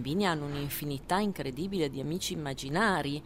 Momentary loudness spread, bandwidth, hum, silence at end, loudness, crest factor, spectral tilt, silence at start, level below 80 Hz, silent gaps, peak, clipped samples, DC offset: 7 LU; 16 kHz; none; 0 s; -32 LUFS; 18 dB; -5 dB/octave; 0 s; -54 dBFS; none; -14 dBFS; under 0.1%; 0.2%